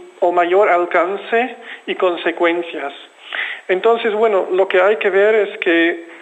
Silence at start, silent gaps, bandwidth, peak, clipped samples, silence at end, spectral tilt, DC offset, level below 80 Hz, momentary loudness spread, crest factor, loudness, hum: 0 s; none; 8.4 kHz; -2 dBFS; under 0.1%; 0 s; -5 dB/octave; under 0.1%; -72 dBFS; 12 LU; 14 dB; -16 LUFS; none